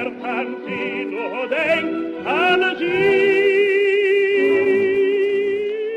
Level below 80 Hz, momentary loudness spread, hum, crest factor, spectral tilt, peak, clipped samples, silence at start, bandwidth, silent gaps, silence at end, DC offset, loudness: -62 dBFS; 9 LU; none; 14 dB; -5.5 dB/octave; -4 dBFS; under 0.1%; 0 s; 8 kHz; none; 0 s; under 0.1%; -18 LUFS